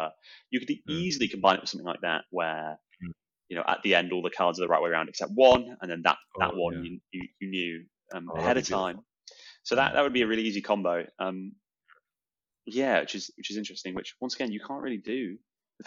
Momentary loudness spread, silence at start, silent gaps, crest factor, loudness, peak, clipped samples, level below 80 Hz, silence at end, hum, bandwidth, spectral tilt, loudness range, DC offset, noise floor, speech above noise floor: 16 LU; 0 s; none; 22 dB; -28 LUFS; -8 dBFS; under 0.1%; -64 dBFS; 0.5 s; none; 7.6 kHz; -2.5 dB/octave; 7 LU; under 0.1%; under -90 dBFS; over 61 dB